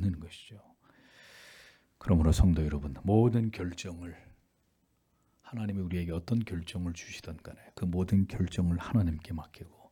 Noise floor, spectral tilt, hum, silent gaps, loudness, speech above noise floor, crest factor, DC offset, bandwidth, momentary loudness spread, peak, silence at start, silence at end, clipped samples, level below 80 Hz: -73 dBFS; -7.5 dB/octave; none; none; -31 LUFS; 43 dB; 20 dB; under 0.1%; 14.5 kHz; 21 LU; -12 dBFS; 0 s; 0.25 s; under 0.1%; -44 dBFS